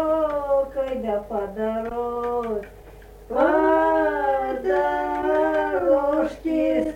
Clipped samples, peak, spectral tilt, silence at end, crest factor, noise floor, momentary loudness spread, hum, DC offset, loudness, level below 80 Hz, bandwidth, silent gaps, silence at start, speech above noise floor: under 0.1%; -6 dBFS; -6.5 dB/octave; 0 s; 16 dB; -44 dBFS; 8 LU; none; under 0.1%; -23 LUFS; -46 dBFS; 16.5 kHz; none; 0 s; 17 dB